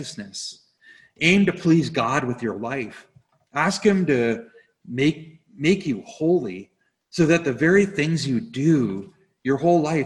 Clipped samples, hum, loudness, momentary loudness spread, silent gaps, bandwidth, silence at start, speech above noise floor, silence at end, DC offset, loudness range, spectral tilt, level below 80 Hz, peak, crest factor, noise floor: under 0.1%; none; -21 LUFS; 14 LU; none; 11.5 kHz; 0 s; 32 dB; 0 s; under 0.1%; 3 LU; -6 dB/octave; -56 dBFS; -2 dBFS; 20 dB; -53 dBFS